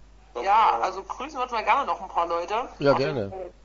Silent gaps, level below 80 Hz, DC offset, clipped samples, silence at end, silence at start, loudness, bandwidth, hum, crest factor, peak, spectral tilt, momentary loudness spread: none; -52 dBFS; under 0.1%; under 0.1%; 0.15 s; 0.35 s; -25 LUFS; 7.6 kHz; none; 18 dB; -6 dBFS; -5.5 dB/octave; 13 LU